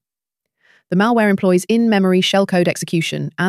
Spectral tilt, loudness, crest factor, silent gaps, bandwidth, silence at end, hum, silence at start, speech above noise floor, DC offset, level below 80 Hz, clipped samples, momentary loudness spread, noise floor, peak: -5.5 dB/octave; -16 LUFS; 14 dB; none; 14.5 kHz; 0 s; none; 0.9 s; 68 dB; under 0.1%; -62 dBFS; under 0.1%; 6 LU; -83 dBFS; -2 dBFS